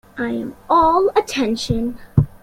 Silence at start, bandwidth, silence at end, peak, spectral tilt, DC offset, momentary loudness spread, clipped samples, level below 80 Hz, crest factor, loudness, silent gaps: 0.15 s; 16 kHz; 0.05 s; -2 dBFS; -6.5 dB/octave; under 0.1%; 10 LU; under 0.1%; -38 dBFS; 16 dB; -18 LUFS; none